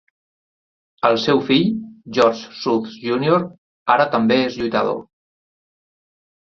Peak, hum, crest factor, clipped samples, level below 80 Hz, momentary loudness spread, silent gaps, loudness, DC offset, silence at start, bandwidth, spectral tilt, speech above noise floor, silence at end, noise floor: 0 dBFS; none; 20 dB; under 0.1%; -58 dBFS; 10 LU; 3.58-3.86 s; -19 LUFS; under 0.1%; 1.05 s; 7.4 kHz; -6 dB/octave; over 72 dB; 1.45 s; under -90 dBFS